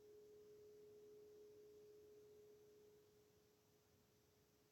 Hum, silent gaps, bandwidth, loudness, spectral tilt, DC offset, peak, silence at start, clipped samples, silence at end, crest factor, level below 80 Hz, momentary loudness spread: none; none; 17 kHz; -66 LUFS; -4.5 dB/octave; under 0.1%; -58 dBFS; 0 s; under 0.1%; 0 s; 10 dB; under -90 dBFS; 3 LU